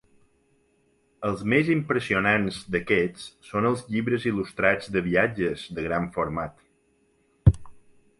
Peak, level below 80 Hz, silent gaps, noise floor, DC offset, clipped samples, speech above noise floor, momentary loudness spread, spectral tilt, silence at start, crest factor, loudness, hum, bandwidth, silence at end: -4 dBFS; -40 dBFS; none; -66 dBFS; under 0.1%; under 0.1%; 41 dB; 10 LU; -7 dB/octave; 1.2 s; 22 dB; -25 LUFS; none; 11.5 kHz; 0.4 s